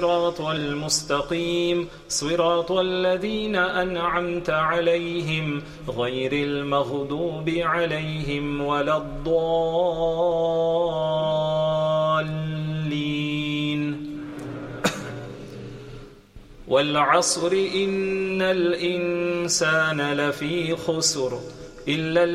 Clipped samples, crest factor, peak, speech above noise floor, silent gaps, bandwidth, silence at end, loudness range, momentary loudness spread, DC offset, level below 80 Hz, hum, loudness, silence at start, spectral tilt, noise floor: under 0.1%; 20 dB; -4 dBFS; 22 dB; none; 14.5 kHz; 0 s; 5 LU; 9 LU; under 0.1%; -48 dBFS; none; -23 LUFS; 0 s; -4 dB/octave; -46 dBFS